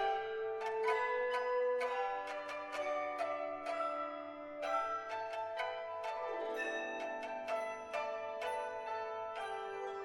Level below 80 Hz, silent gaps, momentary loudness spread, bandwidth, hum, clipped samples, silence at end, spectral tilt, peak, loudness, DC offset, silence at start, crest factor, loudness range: -78 dBFS; none; 7 LU; 16 kHz; none; under 0.1%; 0 s; -2.5 dB/octave; -22 dBFS; -39 LUFS; under 0.1%; 0 s; 18 dB; 3 LU